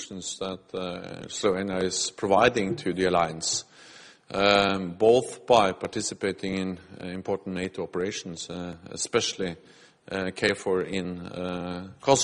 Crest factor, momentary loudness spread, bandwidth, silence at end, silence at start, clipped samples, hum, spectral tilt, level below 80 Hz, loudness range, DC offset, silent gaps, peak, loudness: 22 dB; 14 LU; 11.5 kHz; 0 s; 0 s; under 0.1%; none; -3.5 dB/octave; -58 dBFS; 7 LU; under 0.1%; none; -4 dBFS; -27 LUFS